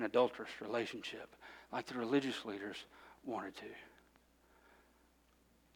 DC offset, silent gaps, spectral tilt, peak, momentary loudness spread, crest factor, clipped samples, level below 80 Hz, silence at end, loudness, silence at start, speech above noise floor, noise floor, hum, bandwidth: under 0.1%; none; -5 dB/octave; -18 dBFS; 19 LU; 24 dB; under 0.1%; -76 dBFS; 1.9 s; -41 LUFS; 0 s; 31 dB; -71 dBFS; none; 18.5 kHz